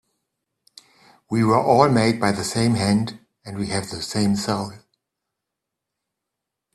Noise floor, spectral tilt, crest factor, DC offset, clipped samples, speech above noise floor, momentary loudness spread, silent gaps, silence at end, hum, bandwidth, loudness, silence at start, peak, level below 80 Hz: -83 dBFS; -5.5 dB/octave; 22 dB; under 0.1%; under 0.1%; 63 dB; 15 LU; none; 2 s; none; 13 kHz; -21 LUFS; 1.3 s; 0 dBFS; -54 dBFS